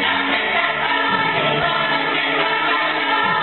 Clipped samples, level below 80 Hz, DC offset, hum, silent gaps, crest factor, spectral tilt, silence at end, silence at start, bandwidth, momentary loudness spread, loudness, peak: under 0.1%; -54 dBFS; 0.2%; none; none; 14 dB; -9 dB/octave; 0 s; 0 s; 4.5 kHz; 1 LU; -17 LUFS; -6 dBFS